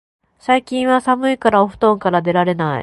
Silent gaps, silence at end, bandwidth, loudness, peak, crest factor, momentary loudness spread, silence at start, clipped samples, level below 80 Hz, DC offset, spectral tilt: none; 0 s; 11.5 kHz; -16 LUFS; 0 dBFS; 16 dB; 3 LU; 0.5 s; under 0.1%; -52 dBFS; under 0.1%; -6.5 dB/octave